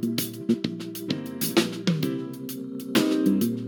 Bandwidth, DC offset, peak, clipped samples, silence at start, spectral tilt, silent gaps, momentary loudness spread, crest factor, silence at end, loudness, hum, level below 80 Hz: 19 kHz; under 0.1%; -6 dBFS; under 0.1%; 0 s; -5 dB/octave; none; 11 LU; 20 dB; 0 s; -26 LUFS; none; -72 dBFS